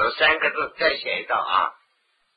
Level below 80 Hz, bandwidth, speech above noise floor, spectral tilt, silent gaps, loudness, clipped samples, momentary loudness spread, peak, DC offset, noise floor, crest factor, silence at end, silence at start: -58 dBFS; 5 kHz; 46 dB; -5.5 dB/octave; none; -22 LUFS; under 0.1%; 6 LU; -4 dBFS; under 0.1%; -68 dBFS; 20 dB; 0.65 s; 0 s